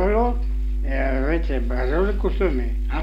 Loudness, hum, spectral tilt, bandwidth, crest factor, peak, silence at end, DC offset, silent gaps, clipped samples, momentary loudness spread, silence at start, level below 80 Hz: -23 LUFS; 50 Hz at -20 dBFS; -8.5 dB/octave; 5.2 kHz; 12 dB; -8 dBFS; 0 s; under 0.1%; none; under 0.1%; 5 LU; 0 s; -22 dBFS